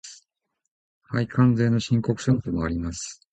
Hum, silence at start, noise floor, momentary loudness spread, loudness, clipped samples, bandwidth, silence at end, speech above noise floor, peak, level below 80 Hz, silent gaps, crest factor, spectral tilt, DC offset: none; 0.05 s; -80 dBFS; 12 LU; -24 LUFS; under 0.1%; 9 kHz; 0.2 s; 57 dB; -8 dBFS; -44 dBFS; 0.71-1.01 s; 16 dB; -6.5 dB/octave; under 0.1%